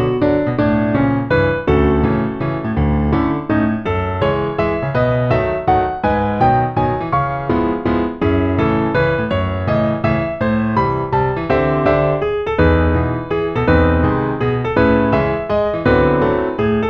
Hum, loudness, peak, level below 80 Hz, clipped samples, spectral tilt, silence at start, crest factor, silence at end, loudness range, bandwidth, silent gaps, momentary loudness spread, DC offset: none; -16 LUFS; 0 dBFS; -28 dBFS; under 0.1%; -9.5 dB/octave; 0 s; 14 dB; 0 s; 2 LU; 6.4 kHz; none; 4 LU; under 0.1%